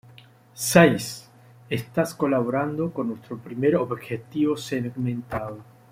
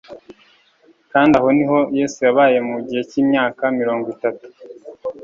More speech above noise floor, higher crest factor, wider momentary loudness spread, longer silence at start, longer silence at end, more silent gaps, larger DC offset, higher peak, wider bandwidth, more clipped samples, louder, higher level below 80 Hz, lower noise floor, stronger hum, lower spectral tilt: second, 27 dB vs 38 dB; first, 22 dB vs 16 dB; first, 16 LU vs 12 LU; first, 0.55 s vs 0.1 s; first, 0.3 s vs 0 s; neither; neither; about the same, -2 dBFS vs -2 dBFS; first, 16.5 kHz vs 7.6 kHz; neither; second, -24 LUFS vs -17 LUFS; about the same, -56 dBFS vs -56 dBFS; about the same, -51 dBFS vs -54 dBFS; neither; about the same, -5.5 dB/octave vs -6 dB/octave